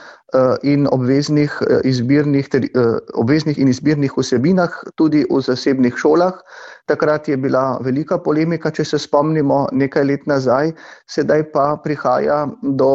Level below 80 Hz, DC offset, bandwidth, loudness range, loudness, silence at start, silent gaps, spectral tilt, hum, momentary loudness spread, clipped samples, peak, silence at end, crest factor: -54 dBFS; under 0.1%; 8 kHz; 2 LU; -16 LUFS; 0 s; none; -7 dB/octave; none; 5 LU; under 0.1%; -2 dBFS; 0 s; 14 dB